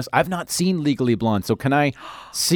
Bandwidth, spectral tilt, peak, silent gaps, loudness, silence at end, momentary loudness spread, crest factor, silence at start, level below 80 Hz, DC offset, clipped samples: 19.5 kHz; -4.5 dB/octave; -2 dBFS; none; -21 LUFS; 0 s; 4 LU; 18 dB; 0 s; -54 dBFS; under 0.1%; under 0.1%